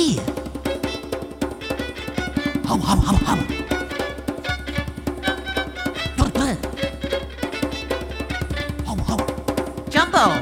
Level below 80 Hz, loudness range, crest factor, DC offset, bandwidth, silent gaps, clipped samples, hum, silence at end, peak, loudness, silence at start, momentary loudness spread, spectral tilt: -32 dBFS; 2 LU; 22 dB; under 0.1%; 17 kHz; none; under 0.1%; none; 0 s; -2 dBFS; -24 LUFS; 0 s; 9 LU; -5 dB/octave